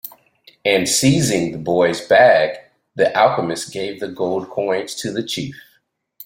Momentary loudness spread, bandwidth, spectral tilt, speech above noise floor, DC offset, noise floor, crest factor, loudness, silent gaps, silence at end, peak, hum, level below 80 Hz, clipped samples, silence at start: 13 LU; 16.5 kHz; -4 dB/octave; 46 dB; under 0.1%; -63 dBFS; 18 dB; -17 LUFS; none; 0 s; -2 dBFS; none; -56 dBFS; under 0.1%; 0.05 s